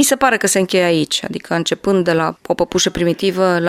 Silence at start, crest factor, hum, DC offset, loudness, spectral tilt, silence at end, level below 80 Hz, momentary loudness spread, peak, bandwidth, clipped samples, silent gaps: 0 s; 16 dB; none; under 0.1%; -16 LUFS; -3.5 dB/octave; 0 s; -46 dBFS; 6 LU; 0 dBFS; 16 kHz; under 0.1%; none